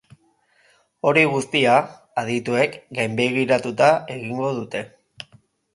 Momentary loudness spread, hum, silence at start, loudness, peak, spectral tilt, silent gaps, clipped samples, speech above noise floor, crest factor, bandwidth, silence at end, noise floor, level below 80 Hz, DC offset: 19 LU; none; 1.05 s; -20 LUFS; -2 dBFS; -5 dB/octave; none; under 0.1%; 41 dB; 20 dB; 11.5 kHz; 0.85 s; -61 dBFS; -66 dBFS; under 0.1%